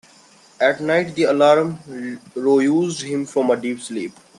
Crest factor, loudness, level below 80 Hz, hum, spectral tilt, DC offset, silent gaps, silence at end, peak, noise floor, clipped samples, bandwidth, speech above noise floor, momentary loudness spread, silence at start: 18 dB; -19 LUFS; -66 dBFS; none; -5 dB/octave; under 0.1%; none; 0.3 s; -2 dBFS; -50 dBFS; under 0.1%; 11.5 kHz; 31 dB; 15 LU; 0.6 s